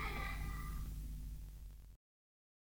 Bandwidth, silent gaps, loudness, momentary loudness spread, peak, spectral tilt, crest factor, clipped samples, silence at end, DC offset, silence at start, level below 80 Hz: over 20 kHz; none; -48 LUFS; 15 LU; -32 dBFS; -5 dB/octave; 14 dB; under 0.1%; 0.75 s; under 0.1%; 0 s; -48 dBFS